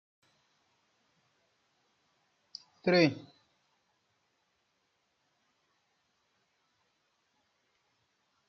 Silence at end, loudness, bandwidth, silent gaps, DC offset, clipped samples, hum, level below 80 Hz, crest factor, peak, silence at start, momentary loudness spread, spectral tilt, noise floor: 5.25 s; -28 LUFS; 7 kHz; none; under 0.1%; under 0.1%; none; -84 dBFS; 26 dB; -14 dBFS; 2.85 s; 24 LU; -4.5 dB/octave; -78 dBFS